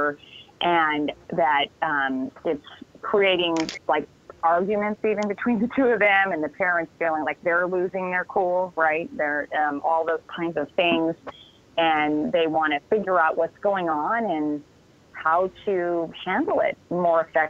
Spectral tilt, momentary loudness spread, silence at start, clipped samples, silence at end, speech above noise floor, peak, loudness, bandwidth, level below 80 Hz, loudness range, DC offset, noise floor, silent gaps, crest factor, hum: -5.5 dB/octave; 8 LU; 0 s; under 0.1%; 0 s; 23 dB; -8 dBFS; -23 LUFS; 7.8 kHz; -62 dBFS; 2 LU; under 0.1%; -47 dBFS; none; 16 dB; none